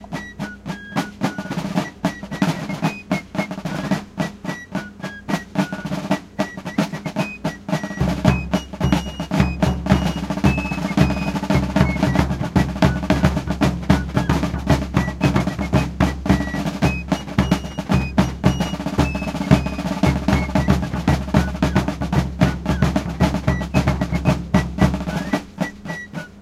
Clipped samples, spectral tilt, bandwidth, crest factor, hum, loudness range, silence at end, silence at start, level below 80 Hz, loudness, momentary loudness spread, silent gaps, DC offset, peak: under 0.1%; -6.5 dB/octave; 14.5 kHz; 20 dB; none; 6 LU; 0 s; 0 s; -30 dBFS; -21 LUFS; 8 LU; none; under 0.1%; 0 dBFS